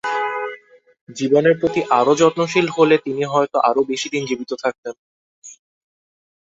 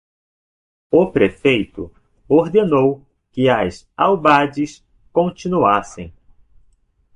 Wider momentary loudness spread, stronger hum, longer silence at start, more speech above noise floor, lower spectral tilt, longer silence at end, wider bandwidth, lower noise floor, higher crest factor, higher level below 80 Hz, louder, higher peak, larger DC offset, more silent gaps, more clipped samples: second, 13 LU vs 18 LU; neither; second, 0.05 s vs 0.9 s; second, 25 dB vs 41 dB; second, -5 dB/octave vs -6.5 dB/octave; about the same, 1 s vs 1.05 s; second, 8 kHz vs 10 kHz; second, -42 dBFS vs -57 dBFS; about the same, 18 dB vs 16 dB; second, -62 dBFS vs -48 dBFS; about the same, -18 LUFS vs -17 LUFS; about the same, -2 dBFS vs -2 dBFS; neither; first, 1.01-1.07 s, 4.78-4.83 s, 4.99-5.42 s vs none; neither